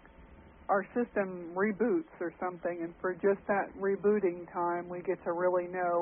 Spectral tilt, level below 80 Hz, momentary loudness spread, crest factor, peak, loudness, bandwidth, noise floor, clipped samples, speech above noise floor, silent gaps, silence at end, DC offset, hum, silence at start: -2 dB/octave; -64 dBFS; 7 LU; 16 dB; -16 dBFS; -33 LUFS; 3.3 kHz; -55 dBFS; under 0.1%; 23 dB; none; 0 s; under 0.1%; none; 0.2 s